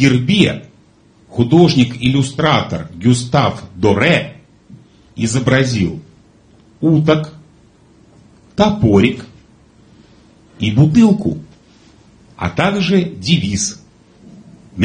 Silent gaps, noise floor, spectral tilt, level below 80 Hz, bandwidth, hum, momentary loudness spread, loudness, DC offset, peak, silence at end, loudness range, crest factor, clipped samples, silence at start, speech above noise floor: none; -49 dBFS; -5.5 dB/octave; -40 dBFS; 10 kHz; none; 14 LU; -14 LUFS; under 0.1%; 0 dBFS; 0 s; 4 LU; 16 dB; under 0.1%; 0 s; 36 dB